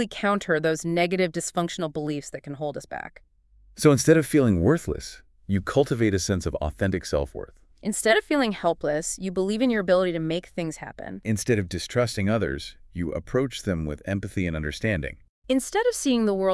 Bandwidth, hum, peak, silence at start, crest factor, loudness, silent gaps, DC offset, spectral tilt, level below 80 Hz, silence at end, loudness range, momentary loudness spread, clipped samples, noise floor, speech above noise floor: 12 kHz; none; -4 dBFS; 0 s; 20 dB; -25 LUFS; 15.29-15.42 s; under 0.1%; -5 dB/octave; -46 dBFS; 0 s; 5 LU; 14 LU; under 0.1%; -57 dBFS; 32 dB